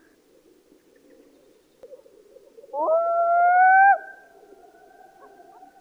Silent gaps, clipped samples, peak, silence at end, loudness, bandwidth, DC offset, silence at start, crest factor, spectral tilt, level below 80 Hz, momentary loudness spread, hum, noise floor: none; under 0.1%; -8 dBFS; 1.7 s; -18 LUFS; 2.6 kHz; under 0.1%; 1.9 s; 16 dB; -4 dB/octave; -78 dBFS; 16 LU; none; -58 dBFS